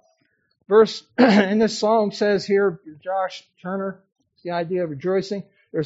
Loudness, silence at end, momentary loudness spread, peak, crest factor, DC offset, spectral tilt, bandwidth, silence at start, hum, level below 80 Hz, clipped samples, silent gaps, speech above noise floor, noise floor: -21 LUFS; 0 s; 15 LU; -2 dBFS; 20 dB; under 0.1%; -4.5 dB/octave; 8 kHz; 0.7 s; none; -66 dBFS; under 0.1%; 4.12-4.16 s; 46 dB; -67 dBFS